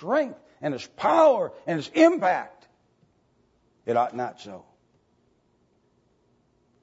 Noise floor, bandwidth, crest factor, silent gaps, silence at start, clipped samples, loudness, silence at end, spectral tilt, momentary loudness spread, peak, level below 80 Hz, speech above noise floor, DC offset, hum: -67 dBFS; 8 kHz; 22 dB; none; 0 s; under 0.1%; -24 LUFS; 2.25 s; -5.5 dB/octave; 22 LU; -6 dBFS; -74 dBFS; 43 dB; under 0.1%; none